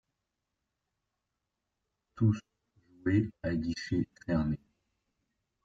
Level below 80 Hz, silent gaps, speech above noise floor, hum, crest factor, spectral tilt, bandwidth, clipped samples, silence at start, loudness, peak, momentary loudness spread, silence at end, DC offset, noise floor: -56 dBFS; none; 55 dB; none; 18 dB; -7.5 dB/octave; 7.6 kHz; under 0.1%; 2.15 s; -33 LUFS; -16 dBFS; 7 LU; 1.1 s; under 0.1%; -86 dBFS